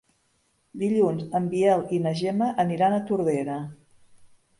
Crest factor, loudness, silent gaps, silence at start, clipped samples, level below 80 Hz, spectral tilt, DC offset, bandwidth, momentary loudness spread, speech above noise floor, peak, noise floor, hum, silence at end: 16 dB; -25 LUFS; none; 0.75 s; under 0.1%; -66 dBFS; -7.5 dB/octave; under 0.1%; 11.5 kHz; 10 LU; 45 dB; -8 dBFS; -69 dBFS; none; 0.35 s